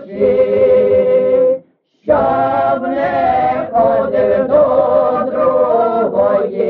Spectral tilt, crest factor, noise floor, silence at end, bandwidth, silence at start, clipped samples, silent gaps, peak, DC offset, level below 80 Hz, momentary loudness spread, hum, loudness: -5.5 dB/octave; 10 dB; -44 dBFS; 0 s; 4.6 kHz; 0 s; under 0.1%; none; -2 dBFS; under 0.1%; -46 dBFS; 5 LU; none; -13 LUFS